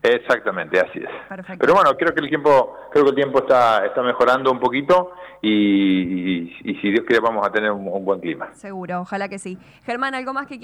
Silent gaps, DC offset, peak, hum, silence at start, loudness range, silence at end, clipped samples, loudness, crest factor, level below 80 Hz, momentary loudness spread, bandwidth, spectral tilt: none; under 0.1%; -6 dBFS; none; 0.05 s; 6 LU; 0.05 s; under 0.1%; -19 LUFS; 12 dB; -58 dBFS; 15 LU; 13 kHz; -6 dB/octave